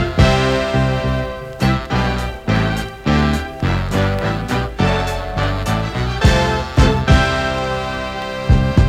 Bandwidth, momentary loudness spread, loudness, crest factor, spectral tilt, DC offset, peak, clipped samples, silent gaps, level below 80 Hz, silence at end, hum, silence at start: 15.5 kHz; 8 LU; -17 LUFS; 14 dB; -6 dB/octave; under 0.1%; -2 dBFS; under 0.1%; none; -22 dBFS; 0 s; none; 0 s